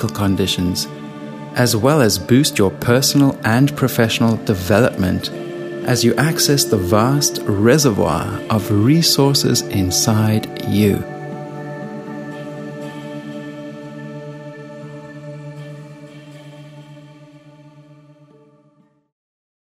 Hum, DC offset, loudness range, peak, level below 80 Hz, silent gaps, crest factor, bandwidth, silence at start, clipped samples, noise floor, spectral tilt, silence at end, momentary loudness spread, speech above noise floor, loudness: none; under 0.1%; 19 LU; 0 dBFS; -48 dBFS; none; 18 dB; 15.5 kHz; 0 s; under 0.1%; -56 dBFS; -4.5 dB/octave; 1.8 s; 20 LU; 41 dB; -16 LUFS